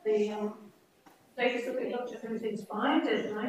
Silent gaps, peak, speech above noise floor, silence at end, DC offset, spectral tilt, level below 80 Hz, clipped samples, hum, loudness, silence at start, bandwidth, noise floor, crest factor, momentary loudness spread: none; -16 dBFS; 29 dB; 0 s; under 0.1%; -5.5 dB/octave; -82 dBFS; under 0.1%; none; -32 LUFS; 0.05 s; 15 kHz; -61 dBFS; 16 dB; 10 LU